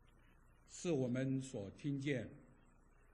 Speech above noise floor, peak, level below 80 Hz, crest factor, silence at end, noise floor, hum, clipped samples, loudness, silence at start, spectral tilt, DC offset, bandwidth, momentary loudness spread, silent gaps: 26 dB; -26 dBFS; -68 dBFS; 18 dB; 0.6 s; -67 dBFS; none; under 0.1%; -42 LUFS; 0.7 s; -6.5 dB/octave; under 0.1%; 11 kHz; 11 LU; none